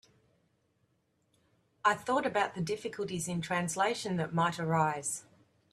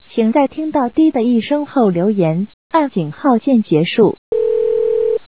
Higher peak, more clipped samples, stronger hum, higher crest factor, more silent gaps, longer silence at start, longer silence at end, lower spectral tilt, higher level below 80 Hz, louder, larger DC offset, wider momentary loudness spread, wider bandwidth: second, -14 dBFS vs -2 dBFS; neither; neither; first, 22 dB vs 14 dB; second, none vs 2.54-2.70 s, 4.18-4.32 s; first, 1.85 s vs 0.15 s; first, 0.5 s vs 0.1 s; second, -4.5 dB/octave vs -11.5 dB/octave; second, -70 dBFS vs -56 dBFS; second, -32 LUFS vs -15 LUFS; second, under 0.1% vs 0.4%; about the same, 6 LU vs 5 LU; first, 13.5 kHz vs 4 kHz